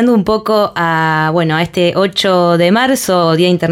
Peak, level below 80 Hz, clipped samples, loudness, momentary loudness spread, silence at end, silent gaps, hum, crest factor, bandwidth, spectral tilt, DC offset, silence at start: -2 dBFS; -46 dBFS; under 0.1%; -12 LUFS; 3 LU; 0 s; none; none; 10 dB; 16.5 kHz; -5.5 dB/octave; under 0.1%; 0 s